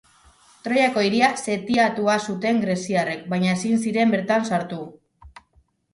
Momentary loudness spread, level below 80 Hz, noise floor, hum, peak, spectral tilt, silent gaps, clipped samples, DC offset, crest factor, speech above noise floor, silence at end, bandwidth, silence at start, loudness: 7 LU; -60 dBFS; -62 dBFS; none; -4 dBFS; -5 dB/octave; none; under 0.1%; under 0.1%; 18 dB; 41 dB; 0.65 s; 11.5 kHz; 0.65 s; -21 LUFS